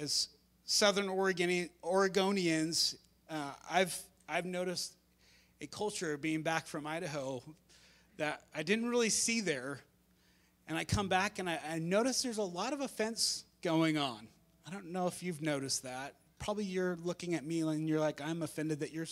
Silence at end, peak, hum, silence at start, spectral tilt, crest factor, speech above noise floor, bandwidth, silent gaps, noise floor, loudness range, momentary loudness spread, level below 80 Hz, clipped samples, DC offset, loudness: 0 s; -12 dBFS; none; 0 s; -3.5 dB/octave; 24 dB; 34 dB; 16 kHz; none; -69 dBFS; 6 LU; 12 LU; -64 dBFS; under 0.1%; under 0.1%; -35 LUFS